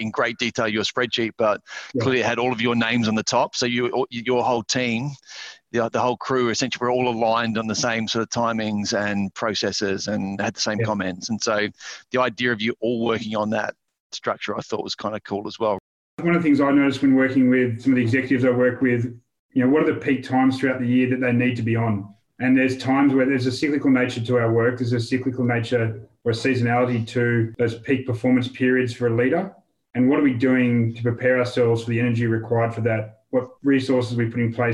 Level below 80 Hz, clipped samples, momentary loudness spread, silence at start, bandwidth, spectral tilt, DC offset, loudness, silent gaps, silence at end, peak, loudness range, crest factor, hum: -62 dBFS; under 0.1%; 8 LU; 0 s; 10 kHz; -5.5 dB/octave; under 0.1%; -22 LUFS; 14.00-14.10 s, 15.80-16.17 s, 19.39-19.49 s; 0 s; -6 dBFS; 4 LU; 16 dB; none